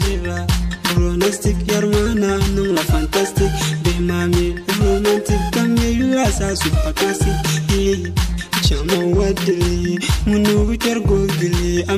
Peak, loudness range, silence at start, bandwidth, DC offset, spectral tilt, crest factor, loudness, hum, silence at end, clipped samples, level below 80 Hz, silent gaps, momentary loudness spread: -4 dBFS; 1 LU; 0 s; 15.5 kHz; under 0.1%; -5 dB/octave; 14 dB; -17 LUFS; none; 0 s; under 0.1%; -24 dBFS; none; 3 LU